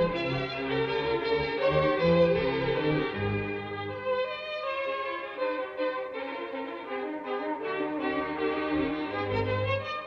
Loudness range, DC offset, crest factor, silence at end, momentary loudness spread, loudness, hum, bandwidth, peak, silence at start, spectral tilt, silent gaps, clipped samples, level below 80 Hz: 6 LU; under 0.1%; 18 dB; 0 s; 10 LU; -30 LUFS; none; 6.4 kHz; -12 dBFS; 0 s; -8 dB/octave; none; under 0.1%; -54 dBFS